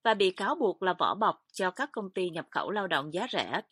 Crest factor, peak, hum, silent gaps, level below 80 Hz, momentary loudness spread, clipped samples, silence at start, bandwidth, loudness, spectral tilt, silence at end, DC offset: 20 dB; -10 dBFS; none; none; -78 dBFS; 7 LU; under 0.1%; 0.05 s; 13 kHz; -30 LUFS; -4.5 dB/octave; 0.1 s; under 0.1%